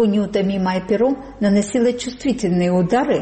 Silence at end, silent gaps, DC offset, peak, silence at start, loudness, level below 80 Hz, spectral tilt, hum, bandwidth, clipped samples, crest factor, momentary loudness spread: 0 s; none; under 0.1%; -8 dBFS; 0 s; -19 LUFS; -46 dBFS; -6.5 dB/octave; none; 8.8 kHz; under 0.1%; 10 dB; 4 LU